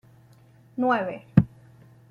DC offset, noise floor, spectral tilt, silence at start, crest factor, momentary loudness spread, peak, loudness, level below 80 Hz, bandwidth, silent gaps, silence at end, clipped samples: under 0.1%; -54 dBFS; -9.5 dB/octave; 0.75 s; 24 dB; 11 LU; -2 dBFS; -25 LUFS; -50 dBFS; 6.4 kHz; none; 0.65 s; under 0.1%